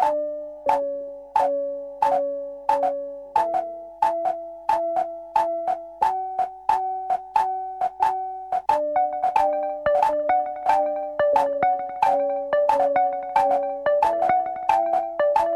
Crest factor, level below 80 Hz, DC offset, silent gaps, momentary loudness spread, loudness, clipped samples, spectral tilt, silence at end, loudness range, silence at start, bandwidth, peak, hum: 14 dB; -58 dBFS; under 0.1%; none; 7 LU; -23 LUFS; under 0.1%; -4.5 dB/octave; 0 s; 4 LU; 0 s; 13 kHz; -8 dBFS; none